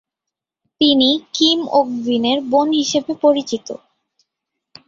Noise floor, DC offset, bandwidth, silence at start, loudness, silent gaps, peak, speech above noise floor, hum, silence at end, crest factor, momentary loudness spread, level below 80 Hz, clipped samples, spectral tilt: -84 dBFS; under 0.1%; 7.8 kHz; 0.8 s; -16 LUFS; none; -2 dBFS; 67 dB; none; 1.1 s; 16 dB; 11 LU; -62 dBFS; under 0.1%; -3.5 dB/octave